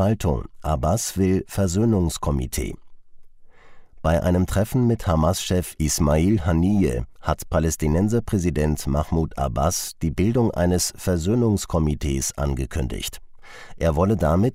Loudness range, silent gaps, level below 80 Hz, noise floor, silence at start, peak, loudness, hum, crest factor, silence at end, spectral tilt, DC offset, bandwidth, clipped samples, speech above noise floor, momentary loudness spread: 3 LU; none; -32 dBFS; -43 dBFS; 0 s; -6 dBFS; -22 LUFS; none; 16 dB; 0 s; -6 dB/octave; under 0.1%; 16 kHz; under 0.1%; 22 dB; 8 LU